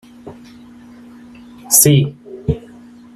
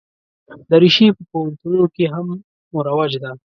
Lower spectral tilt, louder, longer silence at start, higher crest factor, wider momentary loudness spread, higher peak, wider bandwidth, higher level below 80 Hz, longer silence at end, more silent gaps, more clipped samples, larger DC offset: second, -4 dB/octave vs -7 dB/octave; about the same, -14 LUFS vs -16 LUFS; second, 0.25 s vs 0.5 s; about the same, 18 dB vs 16 dB; about the same, 17 LU vs 16 LU; about the same, 0 dBFS vs 0 dBFS; first, 16 kHz vs 6.6 kHz; first, -42 dBFS vs -60 dBFS; first, 0.55 s vs 0.15 s; second, none vs 2.44-2.71 s; neither; neither